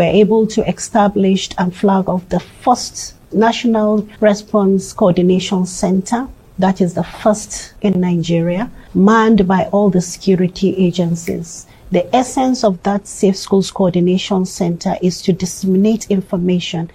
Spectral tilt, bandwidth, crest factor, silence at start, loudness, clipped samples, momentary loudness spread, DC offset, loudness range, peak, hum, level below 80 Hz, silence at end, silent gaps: -6 dB/octave; 13.5 kHz; 14 dB; 0 s; -15 LUFS; under 0.1%; 7 LU; under 0.1%; 2 LU; 0 dBFS; none; -42 dBFS; 0.05 s; none